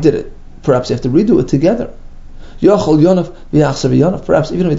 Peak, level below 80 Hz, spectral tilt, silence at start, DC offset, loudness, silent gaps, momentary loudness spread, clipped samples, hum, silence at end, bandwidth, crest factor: 0 dBFS; -32 dBFS; -7.5 dB/octave; 0 s; under 0.1%; -13 LUFS; none; 10 LU; under 0.1%; none; 0 s; 7.8 kHz; 12 dB